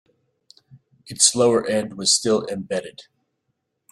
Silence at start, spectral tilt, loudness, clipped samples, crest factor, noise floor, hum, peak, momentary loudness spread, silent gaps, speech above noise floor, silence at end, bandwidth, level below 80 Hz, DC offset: 1.05 s; -2.5 dB/octave; -19 LUFS; under 0.1%; 24 dB; -75 dBFS; none; 0 dBFS; 13 LU; none; 55 dB; 0.9 s; 15 kHz; -64 dBFS; under 0.1%